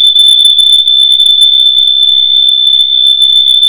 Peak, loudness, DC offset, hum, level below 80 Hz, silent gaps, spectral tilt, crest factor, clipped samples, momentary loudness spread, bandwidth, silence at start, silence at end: 0 dBFS; -2 LUFS; 2%; none; -52 dBFS; none; 4.5 dB/octave; 6 dB; 3%; 2 LU; over 20 kHz; 0 s; 0 s